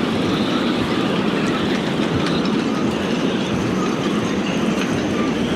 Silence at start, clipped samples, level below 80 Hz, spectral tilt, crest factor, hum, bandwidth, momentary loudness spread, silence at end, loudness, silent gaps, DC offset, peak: 0 s; under 0.1%; -46 dBFS; -5.5 dB/octave; 12 dB; none; 14 kHz; 1 LU; 0 s; -20 LUFS; none; under 0.1%; -6 dBFS